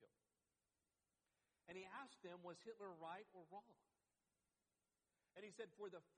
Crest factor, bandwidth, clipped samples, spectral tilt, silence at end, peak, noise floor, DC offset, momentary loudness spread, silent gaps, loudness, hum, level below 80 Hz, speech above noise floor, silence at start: 20 dB; 9.6 kHz; under 0.1%; -4.5 dB/octave; 0.1 s; -40 dBFS; under -90 dBFS; under 0.1%; 6 LU; none; -59 LUFS; none; under -90 dBFS; over 31 dB; 0 s